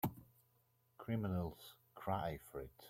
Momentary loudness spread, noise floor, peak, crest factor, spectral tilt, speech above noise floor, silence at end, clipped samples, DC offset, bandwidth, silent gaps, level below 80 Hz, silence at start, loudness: 17 LU; -77 dBFS; -26 dBFS; 20 dB; -7.5 dB/octave; 34 dB; 0 s; under 0.1%; under 0.1%; 16.5 kHz; none; -66 dBFS; 0.05 s; -44 LUFS